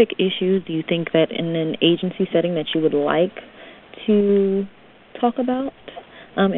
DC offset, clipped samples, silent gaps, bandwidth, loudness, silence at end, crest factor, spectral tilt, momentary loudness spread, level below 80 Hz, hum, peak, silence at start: under 0.1%; under 0.1%; none; 4.1 kHz; -20 LUFS; 0 s; 18 dB; -10.5 dB/octave; 16 LU; -58 dBFS; none; -2 dBFS; 0 s